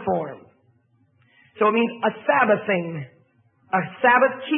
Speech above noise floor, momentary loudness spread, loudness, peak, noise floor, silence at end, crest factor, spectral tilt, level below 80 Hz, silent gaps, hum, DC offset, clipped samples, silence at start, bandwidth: 42 dB; 16 LU; -21 LUFS; -4 dBFS; -62 dBFS; 0 s; 18 dB; -10.5 dB/octave; -70 dBFS; none; none; under 0.1%; under 0.1%; 0 s; 3.8 kHz